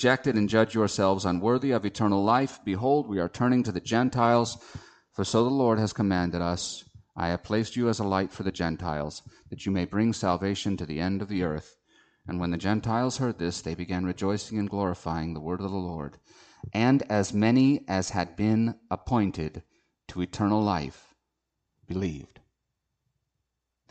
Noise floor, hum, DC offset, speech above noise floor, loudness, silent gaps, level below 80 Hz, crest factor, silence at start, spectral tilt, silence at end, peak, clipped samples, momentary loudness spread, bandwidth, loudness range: -82 dBFS; none; under 0.1%; 56 dB; -27 LUFS; none; -52 dBFS; 20 dB; 0 s; -6 dB/octave; 1.65 s; -8 dBFS; under 0.1%; 13 LU; 9 kHz; 6 LU